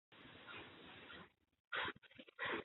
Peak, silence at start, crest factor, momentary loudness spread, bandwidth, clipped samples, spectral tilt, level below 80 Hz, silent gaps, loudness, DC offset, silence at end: -30 dBFS; 0.1 s; 20 dB; 16 LU; 4.2 kHz; under 0.1%; -0.5 dB/octave; -80 dBFS; 1.60-1.71 s; -49 LUFS; under 0.1%; 0 s